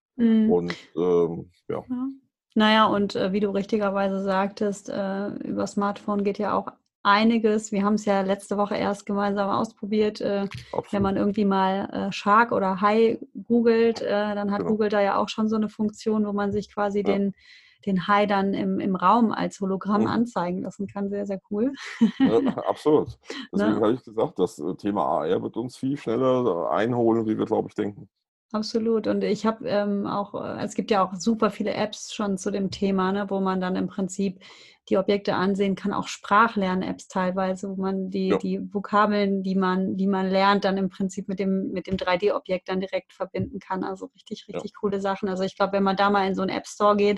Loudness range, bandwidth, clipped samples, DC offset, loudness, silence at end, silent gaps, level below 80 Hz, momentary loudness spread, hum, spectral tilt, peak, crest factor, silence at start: 3 LU; 11.5 kHz; under 0.1%; under 0.1%; -24 LUFS; 0 s; 6.95-7.04 s, 28.28-28.49 s; -58 dBFS; 10 LU; none; -6 dB/octave; -4 dBFS; 20 dB; 0.15 s